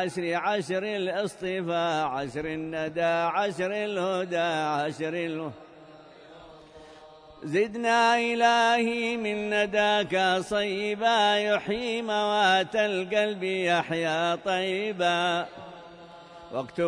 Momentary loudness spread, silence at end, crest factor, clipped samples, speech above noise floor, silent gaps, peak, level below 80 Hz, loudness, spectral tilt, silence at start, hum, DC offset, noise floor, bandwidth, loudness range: 10 LU; 0 s; 18 dB; under 0.1%; 23 dB; none; -10 dBFS; -64 dBFS; -26 LUFS; -4 dB/octave; 0 s; none; under 0.1%; -50 dBFS; 11 kHz; 6 LU